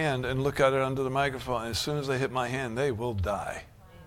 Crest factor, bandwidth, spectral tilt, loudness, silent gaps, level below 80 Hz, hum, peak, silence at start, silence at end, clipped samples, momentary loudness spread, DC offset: 20 dB; 16.5 kHz; -5 dB/octave; -29 LUFS; none; -48 dBFS; none; -8 dBFS; 0 s; 0 s; under 0.1%; 7 LU; under 0.1%